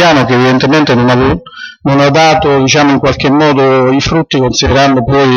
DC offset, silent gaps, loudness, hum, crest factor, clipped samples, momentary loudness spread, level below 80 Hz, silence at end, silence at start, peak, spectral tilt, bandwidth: under 0.1%; none; -8 LUFS; none; 8 dB; under 0.1%; 4 LU; -30 dBFS; 0 s; 0 s; 0 dBFS; -5.5 dB/octave; 7.4 kHz